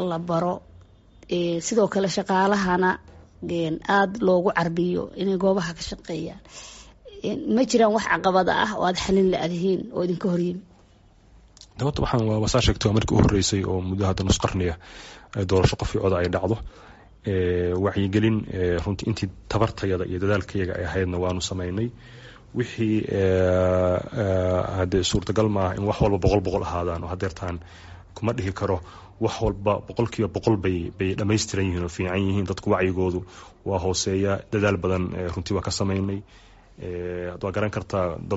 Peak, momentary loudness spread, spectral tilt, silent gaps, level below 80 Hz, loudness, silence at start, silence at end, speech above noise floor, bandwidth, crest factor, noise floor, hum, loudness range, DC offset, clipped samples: -6 dBFS; 11 LU; -5.5 dB/octave; none; -40 dBFS; -24 LUFS; 0 s; 0 s; 31 dB; 8 kHz; 18 dB; -54 dBFS; none; 4 LU; under 0.1%; under 0.1%